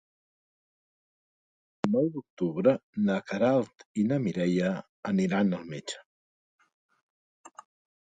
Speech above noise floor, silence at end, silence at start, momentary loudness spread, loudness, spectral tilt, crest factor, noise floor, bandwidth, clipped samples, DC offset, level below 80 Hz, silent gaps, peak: over 62 dB; 0.65 s; 1.85 s; 10 LU; -29 LUFS; -7 dB/octave; 20 dB; under -90 dBFS; 9.2 kHz; under 0.1%; under 0.1%; -70 dBFS; 2.30-2.37 s, 2.83-2.93 s, 3.85-3.95 s, 4.89-5.03 s, 6.06-6.59 s, 6.74-6.89 s, 7.03-7.44 s; -10 dBFS